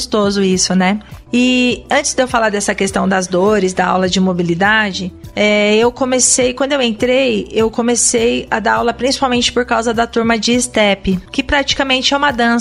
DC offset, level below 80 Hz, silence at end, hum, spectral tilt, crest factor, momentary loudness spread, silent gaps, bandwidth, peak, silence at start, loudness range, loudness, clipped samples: under 0.1%; -38 dBFS; 0 s; none; -3.5 dB/octave; 14 dB; 4 LU; none; 12.5 kHz; 0 dBFS; 0 s; 1 LU; -14 LUFS; under 0.1%